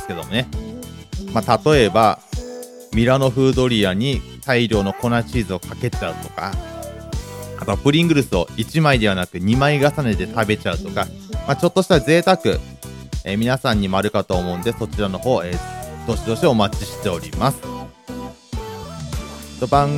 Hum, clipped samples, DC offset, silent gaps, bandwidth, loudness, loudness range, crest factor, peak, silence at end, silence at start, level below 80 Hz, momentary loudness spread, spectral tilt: none; under 0.1%; under 0.1%; none; 17 kHz; -19 LUFS; 5 LU; 20 dB; 0 dBFS; 0 s; 0 s; -34 dBFS; 16 LU; -6 dB/octave